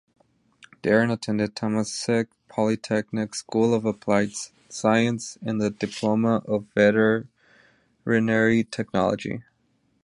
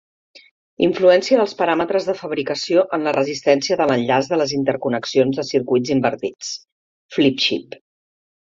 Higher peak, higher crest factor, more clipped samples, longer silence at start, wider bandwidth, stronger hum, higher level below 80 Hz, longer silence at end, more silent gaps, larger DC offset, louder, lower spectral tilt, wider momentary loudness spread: second, -6 dBFS vs -2 dBFS; about the same, 20 dB vs 18 dB; neither; first, 0.85 s vs 0.35 s; first, 11 kHz vs 7.6 kHz; neither; about the same, -60 dBFS vs -62 dBFS; second, 0.65 s vs 0.9 s; second, none vs 0.51-0.77 s, 6.72-7.09 s; neither; second, -24 LUFS vs -19 LUFS; about the same, -5.5 dB/octave vs -4.5 dB/octave; about the same, 10 LU vs 9 LU